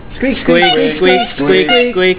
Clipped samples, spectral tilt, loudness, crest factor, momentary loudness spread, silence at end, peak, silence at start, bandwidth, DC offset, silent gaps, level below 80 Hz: under 0.1%; -8.5 dB/octave; -10 LUFS; 10 dB; 4 LU; 0 s; 0 dBFS; 0 s; 4 kHz; 2%; none; -36 dBFS